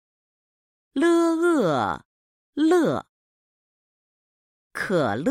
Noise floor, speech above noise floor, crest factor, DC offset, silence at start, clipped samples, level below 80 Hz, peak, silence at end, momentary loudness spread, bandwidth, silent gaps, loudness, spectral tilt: under -90 dBFS; over 68 dB; 16 dB; under 0.1%; 0.95 s; under 0.1%; -64 dBFS; -8 dBFS; 0 s; 14 LU; 14 kHz; 2.05-2.53 s, 3.09-4.70 s; -22 LUFS; -6 dB/octave